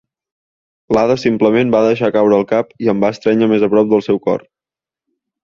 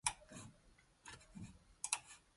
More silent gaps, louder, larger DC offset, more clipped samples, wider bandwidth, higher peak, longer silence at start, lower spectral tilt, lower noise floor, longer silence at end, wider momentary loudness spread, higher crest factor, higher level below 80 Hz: neither; first, -14 LUFS vs -47 LUFS; neither; neither; second, 7.2 kHz vs 11.5 kHz; first, -2 dBFS vs -18 dBFS; first, 0.9 s vs 0.05 s; first, -7 dB/octave vs -1 dB/octave; first, -89 dBFS vs -70 dBFS; first, 1.05 s vs 0.15 s; second, 5 LU vs 17 LU; second, 14 dB vs 32 dB; first, -52 dBFS vs -68 dBFS